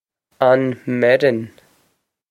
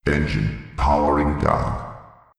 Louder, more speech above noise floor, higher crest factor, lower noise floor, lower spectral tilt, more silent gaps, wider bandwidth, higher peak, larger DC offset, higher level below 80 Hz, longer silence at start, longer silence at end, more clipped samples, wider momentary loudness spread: first, -17 LUFS vs -21 LUFS; first, 50 dB vs 22 dB; about the same, 18 dB vs 16 dB; first, -66 dBFS vs -42 dBFS; about the same, -7.5 dB/octave vs -7.5 dB/octave; neither; first, 12.5 kHz vs 11 kHz; about the same, -2 dBFS vs -4 dBFS; neither; second, -66 dBFS vs -30 dBFS; first, 0.4 s vs 0.05 s; first, 0.8 s vs 0.35 s; neither; about the same, 10 LU vs 10 LU